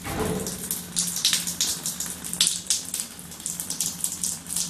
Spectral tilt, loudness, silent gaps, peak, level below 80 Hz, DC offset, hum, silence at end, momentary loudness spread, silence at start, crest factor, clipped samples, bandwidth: -1 dB/octave; -25 LUFS; none; 0 dBFS; -50 dBFS; under 0.1%; none; 0 s; 9 LU; 0 s; 28 dB; under 0.1%; 14 kHz